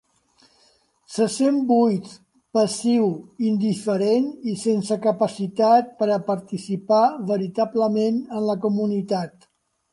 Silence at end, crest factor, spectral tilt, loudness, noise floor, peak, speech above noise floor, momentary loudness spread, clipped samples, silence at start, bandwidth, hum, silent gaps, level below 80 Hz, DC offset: 0.65 s; 16 dB; -6.5 dB/octave; -22 LUFS; -61 dBFS; -6 dBFS; 40 dB; 8 LU; under 0.1%; 1.1 s; 11.5 kHz; none; none; -70 dBFS; under 0.1%